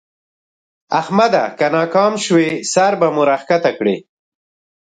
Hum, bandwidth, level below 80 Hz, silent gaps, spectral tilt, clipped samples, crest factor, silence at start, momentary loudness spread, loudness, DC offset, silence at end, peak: none; 9.6 kHz; -64 dBFS; none; -4.5 dB/octave; under 0.1%; 16 dB; 0.9 s; 6 LU; -15 LUFS; under 0.1%; 0.85 s; 0 dBFS